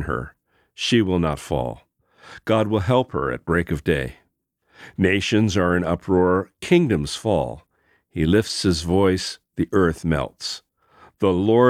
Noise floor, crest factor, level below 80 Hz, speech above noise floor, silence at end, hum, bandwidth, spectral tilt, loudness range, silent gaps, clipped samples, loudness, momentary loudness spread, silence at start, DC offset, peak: -69 dBFS; 18 dB; -42 dBFS; 49 dB; 0 s; none; 14.5 kHz; -6 dB/octave; 3 LU; none; under 0.1%; -21 LUFS; 11 LU; 0 s; under 0.1%; -4 dBFS